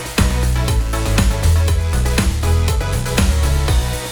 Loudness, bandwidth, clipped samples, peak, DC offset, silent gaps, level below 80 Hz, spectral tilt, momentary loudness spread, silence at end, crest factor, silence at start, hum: -17 LUFS; over 20 kHz; under 0.1%; -2 dBFS; under 0.1%; none; -18 dBFS; -5 dB/octave; 3 LU; 0 s; 14 dB; 0 s; none